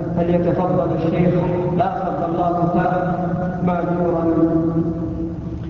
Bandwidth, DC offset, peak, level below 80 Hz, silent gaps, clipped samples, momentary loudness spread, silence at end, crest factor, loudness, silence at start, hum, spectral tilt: 6 kHz; under 0.1%; -4 dBFS; -38 dBFS; none; under 0.1%; 5 LU; 0 s; 14 dB; -19 LUFS; 0 s; none; -10.5 dB/octave